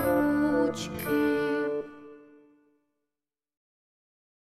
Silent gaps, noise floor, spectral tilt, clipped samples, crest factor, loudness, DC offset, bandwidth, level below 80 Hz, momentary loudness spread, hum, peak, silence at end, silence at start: none; under -90 dBFS; -5.5 dB/octave; under 0.1%; 16 dB; -28 LUFS; under 0.1%; 15 kHz; -58 dBFS; 12 LU; none; -14 dBFS; 2.25 s; 0 s